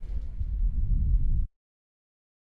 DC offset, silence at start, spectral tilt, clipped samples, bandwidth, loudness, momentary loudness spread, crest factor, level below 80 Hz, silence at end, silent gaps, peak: under 0.1%; 0 s; -11 dB/octave; under 0.1%; 0.8 kHz; -31 LUFS; 9 LU; 12 dB; -28 dBFS; 1 s; none; -14 dBFS